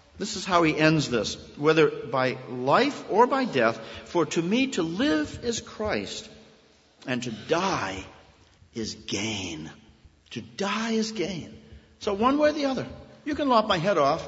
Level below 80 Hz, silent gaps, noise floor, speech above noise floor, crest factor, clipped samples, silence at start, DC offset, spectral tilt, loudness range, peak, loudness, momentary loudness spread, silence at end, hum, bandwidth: -56 dBFS; none; -58 dBFS; 33 dB; 22 dB; under 0.1%; 0.15 s; under 0.1%; -4.5 dB/octave; 8 LU; -4 dBFS; -26 LUFS; 16 LU; 0 s; none; 8 kHz